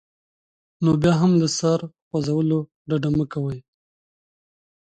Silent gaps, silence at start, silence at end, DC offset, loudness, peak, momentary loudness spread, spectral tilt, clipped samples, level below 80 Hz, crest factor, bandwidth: 2.02-2.11 s, 2.74-2.85 s; 0.8 s; 1.35 s; under 0.1%; -22 LUFS; -6 dBFS; 11 LU; -6.5 dB/octave; under 0.1%; -52 dBFS; 16 dB; 9.2 kHz